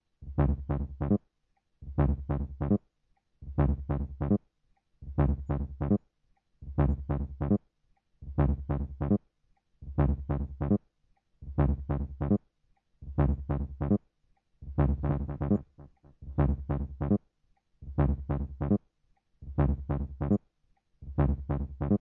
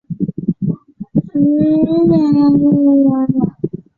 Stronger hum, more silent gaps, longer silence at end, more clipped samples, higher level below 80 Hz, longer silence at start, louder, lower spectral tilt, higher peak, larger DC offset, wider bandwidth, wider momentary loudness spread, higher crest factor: neither; neither; second, 0.05 s vs 0.2 s; neither; first, -38 dBFS vs -48 dBFS; about the same, 0.2 s vs 0.1 s; second, -31 LUFS vs -14 LUFS; first, -13 dB/octave vs -11.5 dB/octave; second, -14 dBFS vs -2 dBFS; neither; second, 3.3 kHz vs 4.6 kHz; about the same, 9 LU vs 10 LU; about the same, 16 dB vs 12 dB